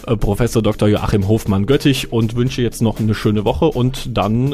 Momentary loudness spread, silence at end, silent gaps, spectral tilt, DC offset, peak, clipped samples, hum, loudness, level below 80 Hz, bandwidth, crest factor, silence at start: 4 LU; 0 s; none; -6.5 dB/octave; under 0.1%; -4 dBFS; under 0.1%; none; -17 LUFS; -30 dBFS; 15.5 kHz; 12 dB; 0 s